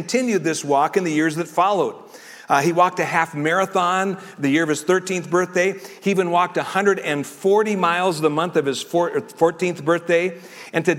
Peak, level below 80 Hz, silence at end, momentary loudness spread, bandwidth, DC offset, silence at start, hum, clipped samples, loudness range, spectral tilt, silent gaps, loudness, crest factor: -4 dBFS; -68 dBFS; 0 s; 6 LU; 16.5 kHz; under 0.1%; 0 s; none; under 0.1%; 1 LU; -4.5 dB/octave; none; -20 LUFS; 16 dB